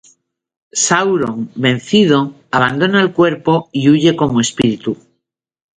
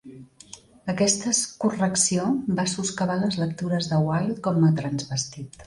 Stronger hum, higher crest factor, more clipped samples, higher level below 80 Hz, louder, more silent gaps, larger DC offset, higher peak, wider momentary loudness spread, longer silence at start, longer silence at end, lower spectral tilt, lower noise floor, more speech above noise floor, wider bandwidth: neither; about the same, 14 dB vs 18 dB; neither; first, -50 dBFS vs -58 dBFS; first, -14 LUFS vs -24 LUFS; neither; neither; first, 0 dBFS vs -6 dBFS; about the same, 8 LU vs 10 LU; first, 0.75 s vs 0.05 s; first, 0.85 s vs 0 s; about the same, -4.5 dB/octave vs -4.5 dB/octave; first, -76 dBFS vs -48 dBFS; first, 62 dB vs 24 dB; second, 9.6 kHz vs 11.5 kHz